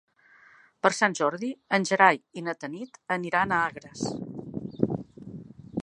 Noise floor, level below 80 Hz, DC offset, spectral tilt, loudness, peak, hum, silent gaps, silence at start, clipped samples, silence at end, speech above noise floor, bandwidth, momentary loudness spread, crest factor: -57 dBFS; -62 dBFS; under 0.1%; -4.5 dB/octave; -27 LUFS; -4 dBFS; none; none; 0.85 s; under 0.1%; 0 s; 31 dB; 11.5 kHz; 17 LU; 24 dB